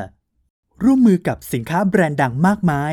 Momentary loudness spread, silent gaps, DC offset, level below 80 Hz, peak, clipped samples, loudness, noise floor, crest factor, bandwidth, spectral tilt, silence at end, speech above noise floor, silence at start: 9 LU; 0.50-0.63 s; under 0.1%; -46 dBFS; -2 dBFS; under 0.1%; -17 LUFS; -36 dBFS; 14 dB; 18 kHz; -7.5 dB/octave; 0 s; 20 dB; 0 s